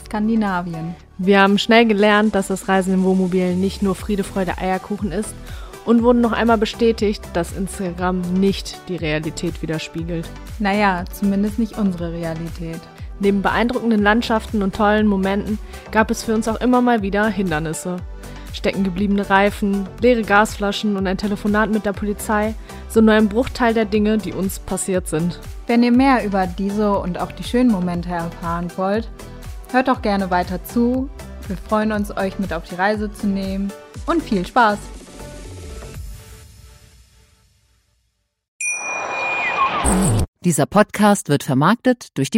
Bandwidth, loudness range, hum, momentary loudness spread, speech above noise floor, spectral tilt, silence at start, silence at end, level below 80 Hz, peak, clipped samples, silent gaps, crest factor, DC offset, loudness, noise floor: 16 kHz; 5 LU; none; 14 LU; 51 dB; -5.5 dB/octave; 0 s; 0 s; -36 dBFS; 0 dBFS; under 0.1%; 38.48-38.59 s, 40.28-40.33 s; 18 dB; under 0.1%; -19 LUFS; -69 dBFS